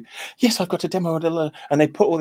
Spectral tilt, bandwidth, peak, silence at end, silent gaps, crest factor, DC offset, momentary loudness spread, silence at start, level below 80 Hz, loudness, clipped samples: -5.5 dB/octave; 16.5 kHz; -2 dBFS; 0 s; none; 20 dB; under 0.1%; 6 LU; 0 s; -68 dBFS; -21 LUFS; under 0.1%